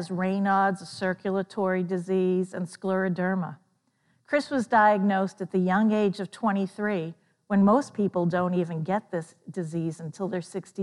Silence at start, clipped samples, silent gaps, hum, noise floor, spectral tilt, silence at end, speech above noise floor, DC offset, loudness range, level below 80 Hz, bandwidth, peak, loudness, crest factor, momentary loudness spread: 0 s; under 0.1%; none; none; -69 dBFS; -7 dB/octave; 0 s; 44 dB; under 0.1%; 3 LU; -76 dBFS; 11.5 kHz; -8 dBFS; -26 LUFS; 18 dB; 12 LU